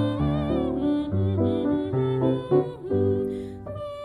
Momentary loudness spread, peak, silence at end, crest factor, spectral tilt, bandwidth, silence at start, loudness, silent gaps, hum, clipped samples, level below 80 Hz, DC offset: 8 LU; -8 dBFS; 0 s; 16 dB; -10 dB/octave; 10 kHz; 0 s; -25 LUFS; none; none; under 0.1%; -44 dBFS; under 0.1%